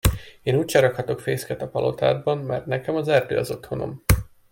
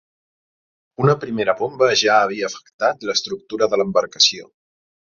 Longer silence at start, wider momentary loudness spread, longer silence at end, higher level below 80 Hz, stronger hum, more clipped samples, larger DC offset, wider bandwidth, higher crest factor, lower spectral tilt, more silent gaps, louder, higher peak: second, 0.05 s vs 1 s; about the same, 9 LU vs 9 LU; second, 0.25 s vs 0.7 s; first, -34 dBFS vs -62 dBFS; neither; neither; neither; first, 16.5 kHz vs 7.6 kHz; about the same, 22 dB vs 18 dB; first, -5.5 dB/octave vs -3.5 dB/octave; second, none vs 2.73-2.79 s; second, -23 LUFS vs -18 LUFS; about the same, -2 dBFS vs -2 dBFS